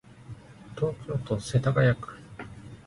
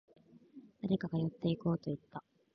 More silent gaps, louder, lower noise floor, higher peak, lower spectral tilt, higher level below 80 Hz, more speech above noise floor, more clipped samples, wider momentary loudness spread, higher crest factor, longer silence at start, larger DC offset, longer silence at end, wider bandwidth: neither; first, -27 LUFS vs -37 LUFS; second, -46 dBFS vs -58 dBFS; first, -10 dBFS vs -20 dBFS; about the same, -7 dB/octave vs -8 dB/octave; first, -52 dBFS vs -68 dBFS; about the same, 20 dB vs 22 dB; neither; first, 23 LU vs 17 LU; about the same, 18 dB vs 18 dB; second, 0.1 s vs 0.55 s; neither; second, 0.05 s vs 0.35 s; first, 11.5 kHz vs 5.8 kHz